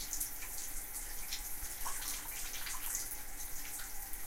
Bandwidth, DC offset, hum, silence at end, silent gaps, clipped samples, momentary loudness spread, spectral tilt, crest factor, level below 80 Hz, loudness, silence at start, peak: 17 kHz; under 0.1%; none; 0 s; none; under 0.1%; 5 LU; 0 dB/octave; 20 dB; -48 dBFS; -40 LUFS; 0 s; -20 dBFS